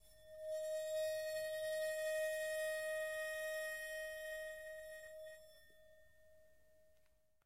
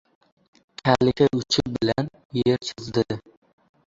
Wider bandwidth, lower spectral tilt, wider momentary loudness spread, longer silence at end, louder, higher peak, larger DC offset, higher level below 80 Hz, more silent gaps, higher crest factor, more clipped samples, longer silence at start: first, 16 kHz vs 7.8 kHz; second, 0 dB/octave vs -5.5 dB/octave; first, 13 LU vs 9 LU; second, 0 s vs 0.65 s; second, -43 LUFS vs -23 LUFS; second, -32 dBFS vs -2 dBFS; neither; second, -78 dBFS vs -52 dBFS; second, none vs 2.25-2.30 s; second, 12 dB vs 22 dB; neither; second, 0.05 s vs 0.85 s